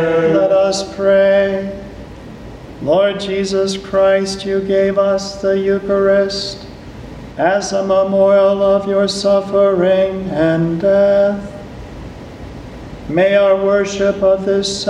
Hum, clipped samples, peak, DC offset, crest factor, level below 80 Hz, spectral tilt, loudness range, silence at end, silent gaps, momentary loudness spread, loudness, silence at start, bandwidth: none; under 0.1%; -2 dBFS; under 0.1%; 14 dB; -40 dBFS; -5 dB/octave; 3 LU; 0 s; none; 20 LU; -14 LUFS; 0 s; 10.5 kHz